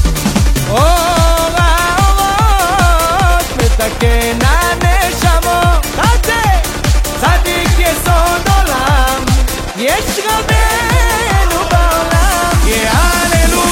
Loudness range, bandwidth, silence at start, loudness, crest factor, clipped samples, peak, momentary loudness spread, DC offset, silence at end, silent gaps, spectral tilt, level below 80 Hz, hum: 1 LU; 17 kHz; 0 s; -11 LUFS; 10 dB; under 0.1%; 0 dBFS; 3 LU; under 0.1%; 0 s; none; -4 dB/octave; -14 dBFS; none